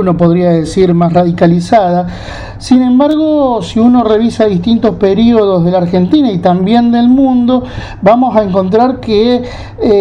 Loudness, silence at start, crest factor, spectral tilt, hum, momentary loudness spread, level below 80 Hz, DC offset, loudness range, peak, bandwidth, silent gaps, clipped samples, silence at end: -9 LUFS; 0 s; 8 dB; -8 dB/octave; none; 6 LU; -34 dBFS; under 0.1%; 1 LU; 0 dBFS; 10 kHz; none; 0.2%; 0 s